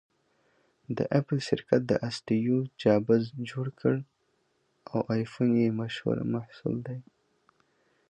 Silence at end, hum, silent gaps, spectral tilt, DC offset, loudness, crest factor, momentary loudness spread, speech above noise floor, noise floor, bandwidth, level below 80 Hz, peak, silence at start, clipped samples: 1.1 s; none; none; -7.5 dB/octave; under 0.1%; -29 LUFS; 22 dB; 10 LU; 45 dB; -73 dBFS; 9.2 kHz; -66 dBFS; -8 dBFS; 0.9 s; under 0.1%